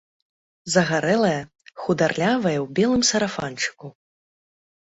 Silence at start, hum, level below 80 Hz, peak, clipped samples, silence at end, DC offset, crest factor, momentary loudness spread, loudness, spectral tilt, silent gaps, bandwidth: 0.65 s; none; -58 dBFS; -4 dBFS; under 0.1%; 1 s; under 0.1%; 20 dB; 10 LU; -22 LUFS; -4 dB/octave; none; 8.4 kHz